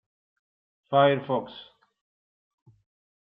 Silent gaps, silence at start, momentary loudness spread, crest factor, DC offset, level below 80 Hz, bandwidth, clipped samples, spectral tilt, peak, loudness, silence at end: none; 0.9 s; 22 LU; 20 dB; under 0.1%; -76 dBFS; 5 kHz; under 0.1%; -4 dB/octave; -10 dBFS; -24 LUFS; 1.65 s